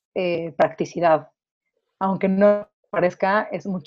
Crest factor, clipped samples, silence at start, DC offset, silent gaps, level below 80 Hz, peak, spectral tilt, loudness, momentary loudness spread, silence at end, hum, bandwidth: 18 dB; under 0.1%; 0.15 s; under 0.1%; 1.51-1.61 s, 2.73-2.83 s; -64 dBFS; -4 dBFS; -7 dB/octave; -22 LUFS; 8 LU; 0.05 s; none; 7.2 kHz